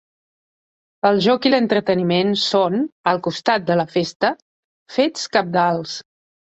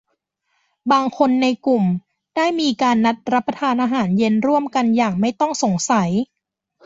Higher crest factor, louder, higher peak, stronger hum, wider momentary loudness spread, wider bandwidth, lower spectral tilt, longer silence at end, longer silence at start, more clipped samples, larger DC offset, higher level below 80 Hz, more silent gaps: about the same, 18 dB vs 16 dB; about the same, -19 LUFS vs -18 LUFS; about the same, -2 dBFS vs -2 dBFS; neither; about the same, 6 LU vs 5 LU; about the same, 8.2 kHz vs 7.8 kHz; about the same, -5 dB/octave vs -5.5 dB/octave; second, 0.45 s vs 0.6 s; first, 1.05 s vs 0.85 s; neither; neither; about the same, -62 dBFS vs -60 dBFS; first, 2.92-3.04 s, 4.15-4.20 s, 4.42-4.86 s vs none